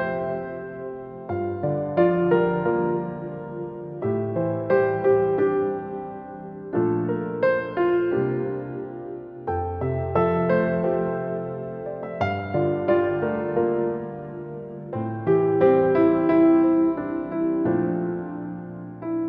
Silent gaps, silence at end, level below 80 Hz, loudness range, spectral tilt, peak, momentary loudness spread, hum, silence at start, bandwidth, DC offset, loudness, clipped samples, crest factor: none; 0 s; -54 dBFS; 5 LU; -10.5 dB/octave; -6 dBFS; 16 LU; none; 0 s; 5.2 kHz; under 0.1%; -24 LUFS; under 0.1%; 18 dB